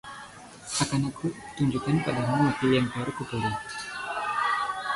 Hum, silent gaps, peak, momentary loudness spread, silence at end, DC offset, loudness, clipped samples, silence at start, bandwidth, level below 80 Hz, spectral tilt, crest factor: none; none; -12 dBFS; 10 LU; 0 s; under 0.1%; -28 LUFS; under 0.1%; 0.05 s; 11.5 kHz; -56 dBFS; -5 dB/octave; 16 dB